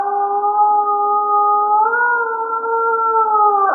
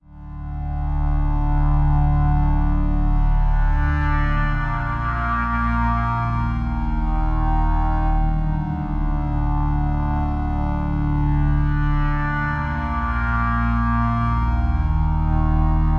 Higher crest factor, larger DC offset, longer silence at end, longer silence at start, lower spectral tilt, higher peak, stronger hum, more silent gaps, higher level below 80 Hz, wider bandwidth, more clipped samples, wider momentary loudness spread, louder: about the same, 12 dB vs 12 dB; neither; about the same, 0 s vs 0 s; about the same, 0 s vs 0.1 s; second, -3 dB/octave vs -9.5 dB/octave; first, -4 dBFS vs -8 dBFS; neither; neither; second, under -90 dBFS vs -22 dBFS; second, 1.7 kHz vs 4.4 kHz; neither; about the same, 5 LU vs 4 LU; first, -15 LUFS vs -22 LUFS